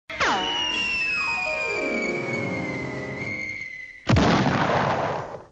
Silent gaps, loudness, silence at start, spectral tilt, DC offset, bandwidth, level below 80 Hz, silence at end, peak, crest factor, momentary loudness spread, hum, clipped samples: none; -24 LUFS; 0.1 s; -5 dB/octave; under 0.1%; 8.6 kHz; -44 dBFS; 0.05 s; -8 dBFS; 16 dB; 10 LU; none; under 0.1%